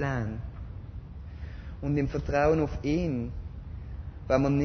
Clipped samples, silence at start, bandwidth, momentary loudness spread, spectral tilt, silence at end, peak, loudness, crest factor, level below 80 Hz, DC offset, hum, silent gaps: under 0.1%; 0 s; 6.6 kHz; 17 LU; -8 dB/octave; 0 s; -10 dBFS; -29 LUFS; 20 dB; -40 dBFS; under 0.1%; none; none